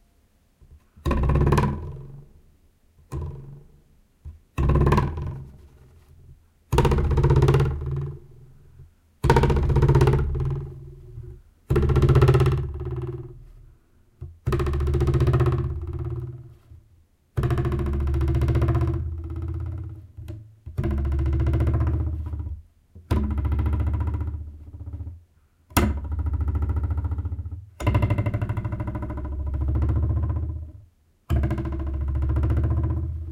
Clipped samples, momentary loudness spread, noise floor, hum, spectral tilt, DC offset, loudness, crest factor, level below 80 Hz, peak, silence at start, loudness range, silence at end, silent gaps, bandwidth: under 0.1%; 19 LU; -61 dBFS; none; -8 dB/octave; under 0.1%; -24 LUFS; 22 dB; -28 dBFS; -4 dBFS; 0.7 s; 5 LU; 0 s; none; 16 kHz